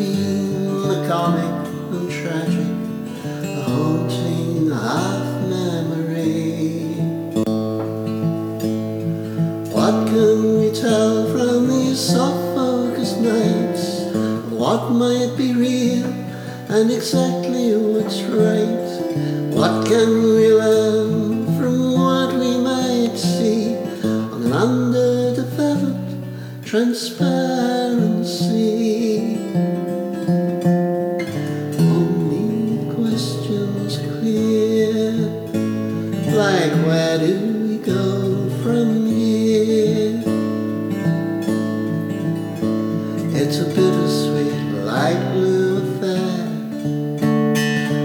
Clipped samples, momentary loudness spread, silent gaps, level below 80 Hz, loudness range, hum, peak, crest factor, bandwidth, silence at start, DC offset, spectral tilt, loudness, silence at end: under 0.1%; 7 LU; none; -60 dBFS; 5 LU; none; -2 dBFS; 16 dB; 19.5 kHz; 0 s; under 0.1%; -6.5 dB/octave; -19 LUFS; 0 s